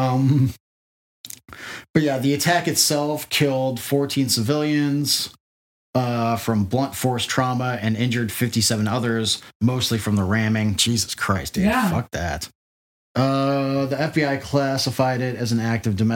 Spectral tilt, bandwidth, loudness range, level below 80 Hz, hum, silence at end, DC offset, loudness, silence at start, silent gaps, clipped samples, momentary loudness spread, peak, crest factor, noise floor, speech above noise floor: -4.5 dB/octave; 17 kHz; 2 LU; -52 dBFS; none; 0 s; under 0.1%; -21 LUFS; 0 s; 0.60-1.24 s, 1.90-1.94 s, 5.40-5.93 s, 9.55-9.60 s, 12.55-13.15 s; under 0.1%; 6 LU; -4 dBFS; 18 dB; under -90 dBFS; over 69 dB